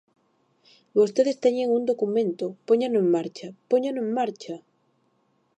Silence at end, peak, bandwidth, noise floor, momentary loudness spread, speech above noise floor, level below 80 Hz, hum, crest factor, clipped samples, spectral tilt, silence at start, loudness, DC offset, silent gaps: 1 s; -8 dBFS; 8.8 kHz; -68 dBFS; 14 LU; 45 dB; -78 dBFS; none; 16 dB; under 0.1%; -6.5 dB/octave; 0.95 s; -24 LUFS; under 0.1%; none